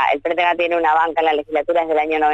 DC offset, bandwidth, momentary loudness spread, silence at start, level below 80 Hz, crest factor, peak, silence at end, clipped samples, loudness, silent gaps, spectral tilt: under 0.1%; 7.8 kHz; 3 LU; 0 s; -54 dBFS; 12 dB; -4 dBFS; 0 s; under 0.1%; -17 LUFS; none; -4.5 dB/octave